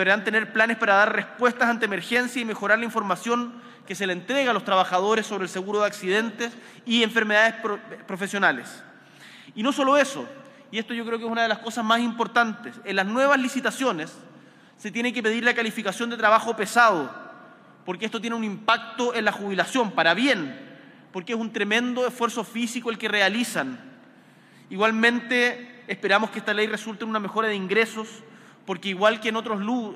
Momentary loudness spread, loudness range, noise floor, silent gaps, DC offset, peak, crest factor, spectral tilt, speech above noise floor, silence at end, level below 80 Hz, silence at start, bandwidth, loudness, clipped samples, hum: 14 LU; 3 LU; -52 dBFS; none; under 0.1%; -6 dBFS; 20 dB; -3.5 dB/octave; 28 dB; 0 s; -78 dBFS; 0 s; 15.5 kHz; -23 LUFS; under 0.1%; none